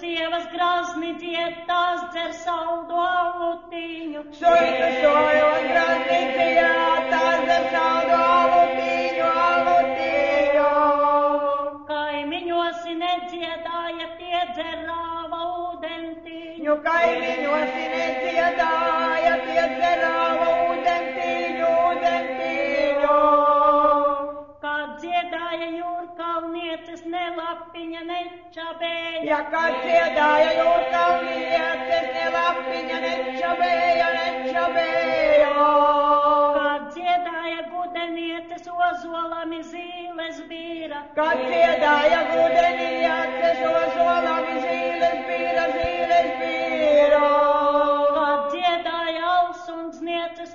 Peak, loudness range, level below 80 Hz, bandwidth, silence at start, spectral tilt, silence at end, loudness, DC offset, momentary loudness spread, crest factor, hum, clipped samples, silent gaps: -6 dBFS; 9 LU; -56 dBFS; 7.2 kHz; 0 s; -4 dB/octave; 0 s; -21 LUFS; under 0.1%; 13 LU; 16 dB; none; under 0.1%; none